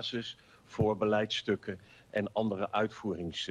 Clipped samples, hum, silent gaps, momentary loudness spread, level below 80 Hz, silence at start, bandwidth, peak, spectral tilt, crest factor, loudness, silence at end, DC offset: under 0.1%; none; none; 14 LU; -62 dBFS; 0 s; 11 kHz; -16 dBFS; -5.5 dB/octave; 16 dB; -33 LUFS; 0 s; under 0.1%